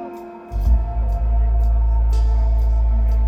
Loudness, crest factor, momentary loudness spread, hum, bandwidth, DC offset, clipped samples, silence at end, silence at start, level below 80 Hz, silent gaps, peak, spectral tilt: -20 LUFS; 10 dB; 7 LU; none; 2.7 kHz; under 0.1%; under 0.1%; 0 s; 0 s; -16 dBFS; none; -6 dBFS; -9 dB/octave